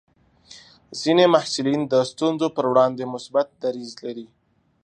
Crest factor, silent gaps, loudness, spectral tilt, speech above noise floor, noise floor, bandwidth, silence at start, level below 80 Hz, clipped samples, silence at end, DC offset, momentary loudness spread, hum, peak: 20 dB; none; -21 LUFS; -5 dB/octave; 29 dB; -50 dBFS; 10 kHz; 0.5 s; -68 dBFS; under 0.1%; 0.6 s; under 0.1%; 16 LU; none; -2 dBFS